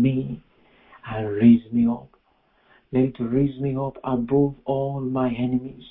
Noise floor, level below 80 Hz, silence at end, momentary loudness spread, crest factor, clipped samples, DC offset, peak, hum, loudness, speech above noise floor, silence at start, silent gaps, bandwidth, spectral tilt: -63 dBFS; -50 dBFS; 0 s; 14 LU; 18 dB; under 0.1%; under 0.1%; -4 dBFS; none; -23 LUFS; 42 dB; 0 s; none; 3.9 kHz; -13 dB/octave